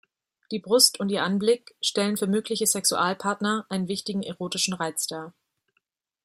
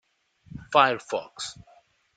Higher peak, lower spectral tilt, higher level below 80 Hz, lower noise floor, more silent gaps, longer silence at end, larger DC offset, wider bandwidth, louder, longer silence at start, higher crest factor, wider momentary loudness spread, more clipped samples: about the same, -2 dBFS vs -4 dBFS; about the same, -3 dB/octave vs -3 dB/octave; second, -72 dBFS vs -60 dBFS; first, -76 dBFS vs -56 dBFS; neither; first, 0.95 s vs 0.65 s; neither; first, 16 kHz vs 9.4 kHz; about the same, -24 LUFS vs -25 LUFS; about the same, 0.5 s vs 0.55 s; about the same, 24 dB vs 24 dB; second, 12 LU vs 23 LU; neither